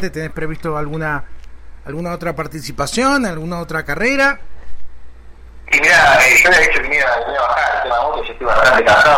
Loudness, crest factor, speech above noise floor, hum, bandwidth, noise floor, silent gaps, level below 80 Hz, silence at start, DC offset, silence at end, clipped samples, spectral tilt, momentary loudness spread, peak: -14 LUFS; 14 dB; 22 dB; none; 16.5 kHz; -36 dBFS; none; -34 dBFS; 0 s; under 0.1%; 0 s; under 0.1%; -3.5 dB/octave; 17 LU; -2 dBFS